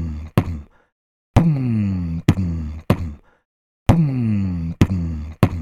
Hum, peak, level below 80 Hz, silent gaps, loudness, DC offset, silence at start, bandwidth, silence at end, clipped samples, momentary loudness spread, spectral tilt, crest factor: none; 0 dBFS; -32 dBFS; 0.92-1.34 s, 3.45-3.86 s; -20 LUFS; under 0.1%; 0 s; 14.5 kHz; 0 s; under 0.1%; 9 LU; -8 dB/octave; 20 dB